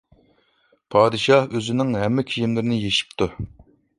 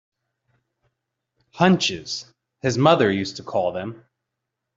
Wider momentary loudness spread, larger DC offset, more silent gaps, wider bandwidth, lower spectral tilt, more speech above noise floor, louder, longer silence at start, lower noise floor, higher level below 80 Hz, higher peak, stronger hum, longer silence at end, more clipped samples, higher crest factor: second, 9 LU vs 14 LU; neither; neither; first, 11.5 kHz vs 7.8 kHz; about the same, -5.5 dB/octave vs -5 dB/octave; second, 43 dB vs 61 dB; about the same, -21 LUFS vs -21 LUFS; second, 0.9 s vs 1.55 s; second, -63 dBFS vs -82 dBFS; first, -50 dBFS vs -60 dBFS; about the same, -2 dBFS vs -2 dBFS; neither; second, 0.5 s vs 0.8 s; neither; about the same, 20 dB vs 22 dB